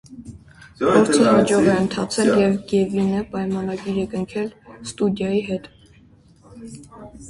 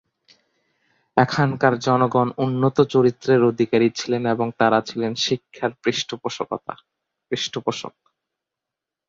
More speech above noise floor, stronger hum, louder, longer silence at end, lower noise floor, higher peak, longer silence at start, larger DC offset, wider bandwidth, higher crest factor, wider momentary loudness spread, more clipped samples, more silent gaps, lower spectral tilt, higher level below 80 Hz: second, 32 dB vs 66 dB; neither; about the same, -20 LUFS vs -21 LUFS; second, 0 s vs 1.2 s; second, -51 dBFS vs -86 dBFS; about the same, -2 dBFS vs -2 dBFS; second, 0.1 s vs 1.15 s; neither; first, 11.5 kHz vs 7.6 kHz; about the same, 18 dB vs 20 dB; first, 24 LU vs 10 LU; neither; neither; about the same, -5.5 dB/octave vs -5.5 dB/octave; first, -50 dBFS vs -62 dBFS